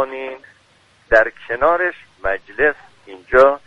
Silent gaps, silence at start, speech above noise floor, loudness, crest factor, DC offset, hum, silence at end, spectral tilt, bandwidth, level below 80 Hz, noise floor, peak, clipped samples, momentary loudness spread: none; 0 s; 37 dB; -17 LUFS; 18 dB; under 0.1%; none; 0.1 s; -5.5 dB/octave; 7.4 kHz; -42 dBFS; -54 dBFS; 0 dBFS; under 0.1%; 17 LU